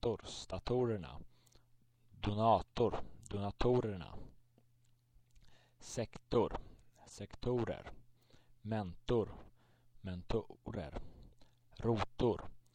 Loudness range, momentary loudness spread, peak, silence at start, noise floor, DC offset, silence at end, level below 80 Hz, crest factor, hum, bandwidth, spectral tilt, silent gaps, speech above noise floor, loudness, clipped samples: 5 LU; 18 LU; -18 dBFS; 0.05 s; -71 dBFS; under 0.1%; 0.15 s; -54 dBFS; 22 dB; none; 10.5 kHz; -6.5 dB/octave; none; 33 dB; -39 LUFS; under 0.1%